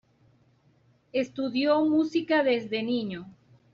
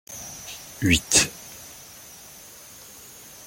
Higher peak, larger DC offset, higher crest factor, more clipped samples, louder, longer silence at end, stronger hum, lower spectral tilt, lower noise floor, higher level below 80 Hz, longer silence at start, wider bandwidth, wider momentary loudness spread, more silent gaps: second, -12 dBFS vs -2 dBFS; neither; second, 16 dB vs 26 dB; neither; second, -26 LUFS vs -21 LUFS; second, 0.45 s vs 1.75 s; neither; first, -3.5 dB/octave vs -2 dB/octave; first, -64 dBFS vs -45 dBFS; second, -70 dBFS vs -46 dBFS; first, 1.15 s vs 0.1 s; second, 7.2 kHz vs 17 kHz; second, 9 LU vs 24 LU; neither